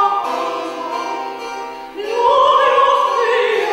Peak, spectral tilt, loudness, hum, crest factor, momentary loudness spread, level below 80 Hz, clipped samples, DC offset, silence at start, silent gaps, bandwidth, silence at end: -4 dBFS; -2 dB/octave; -16 LUFS; none; 12 dB; 15 LU; -58 dBFS; under 0.1%; under 0.1%; 0 s; none; 16 kHz; 0 s